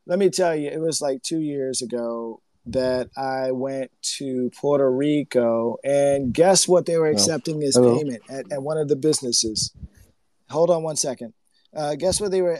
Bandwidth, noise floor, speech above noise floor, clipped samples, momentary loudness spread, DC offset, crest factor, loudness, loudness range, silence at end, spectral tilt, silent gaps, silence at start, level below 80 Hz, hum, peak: 13 kHz; -58 dBFS; 36 dB; under 0.1%; 12 LU; under 0.1%; 20 dB; -22 LUFS; 6 LU; 0 s; -4 dB/octave; none; 0.05 s; -54 dBFS; none; -2 dBFS